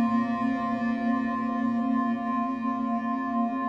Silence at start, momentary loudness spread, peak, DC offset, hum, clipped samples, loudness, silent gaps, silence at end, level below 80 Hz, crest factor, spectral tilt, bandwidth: 0 s; 2 LU; -16 dBFS; under 0.1%; none; under 0.1%; -28 LUFS; none; 0 s; -62 dBFS; 12 dB; -7.5 dB/octave; 6.6 kHz